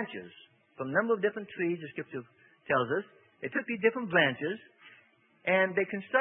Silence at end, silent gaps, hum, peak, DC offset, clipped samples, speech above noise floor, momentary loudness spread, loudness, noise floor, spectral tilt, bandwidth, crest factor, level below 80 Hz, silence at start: 0 s; none; none; -10 dBFS; under 0.1%; under 0.1%; 33 dB; 16 LU; -30 LUFS; -64 dBFS; -9 dB/octave; 3.8 kHz; 22 dB; -78 dBFS; 0 s